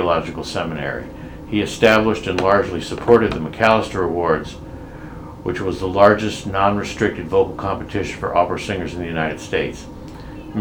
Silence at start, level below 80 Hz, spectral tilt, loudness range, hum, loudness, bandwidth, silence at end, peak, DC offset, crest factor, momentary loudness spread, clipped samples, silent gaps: 0 s; -40 dBFS; -5.5 dB/octave; 4 LU; none; -19 LUFS; 17.5 kHz; 0 s; 0 dBFS; under 0.1%; 20 dB; 20 LU; under 0.1%; none